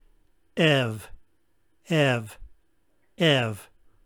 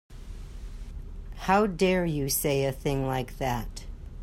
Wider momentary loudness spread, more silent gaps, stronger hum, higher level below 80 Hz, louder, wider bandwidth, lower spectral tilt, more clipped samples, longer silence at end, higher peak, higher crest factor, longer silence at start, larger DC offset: about the same, 18 LU vs 20 LU; neither; neither; second, -56 dBFS vs -40 dBFS; first, -24 LUFS vs -27 LUFS; first, over 20 kHz vs 16 kHz; about the same, -5.5 dB/octave vs -5 dB/octave; neither; first, 0.4 s vs 0 s; first, -6 dBFS vs -12 dBFS; about the same, 20 dB vs 18 dB; first, 0.55 s vs 0.1 s; neither